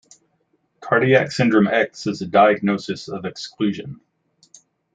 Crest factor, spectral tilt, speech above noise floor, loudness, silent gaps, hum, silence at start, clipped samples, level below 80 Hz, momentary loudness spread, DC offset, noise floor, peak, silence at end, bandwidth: 18 dB; -6 dB/octave; 48 dB; -19 LUFS; none; none; 0.8 s; under 0.1%; -64 dBFS; 15 LU; under 0.1%; -67 dBFS; -2 dBFS; 1 s; 9.2 kHz